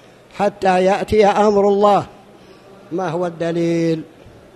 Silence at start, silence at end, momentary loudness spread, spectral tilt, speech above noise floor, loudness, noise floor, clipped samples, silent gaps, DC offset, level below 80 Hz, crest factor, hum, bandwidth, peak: 0.35 s; 0.25 s; 11 LU; -6.5 dB/octave; 28 dB; -16 LUFS; -44 dBFS; under 0.1%; none; under 0.1%; -46 dBFS; 16 dB; none; 12 kHz; 0 dBFS